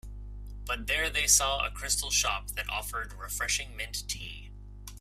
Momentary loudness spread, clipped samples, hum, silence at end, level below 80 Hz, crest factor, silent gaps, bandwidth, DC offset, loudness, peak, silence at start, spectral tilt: 23 LU; under 0.1%; 50 Hz at -40 dBFS; 0 s; -42 dBFS; 24 dB; none; 16 kHz; under 0.1%; -29 LUFS; -8 dBFS; 0.05 s; 0 dB/octave